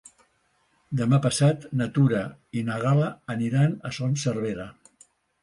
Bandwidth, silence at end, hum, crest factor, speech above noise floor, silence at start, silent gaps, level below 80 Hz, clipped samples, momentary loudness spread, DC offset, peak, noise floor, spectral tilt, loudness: 11.5 kHz; 0.7 s; none; 16 dB; 44 dB; 0.9 s; none; -60 dBFS; under 0.1%; 10 LU; under 0.1%; -10 dBFS; -68 dBFS; -6.5 dB/octave; -25 LUFS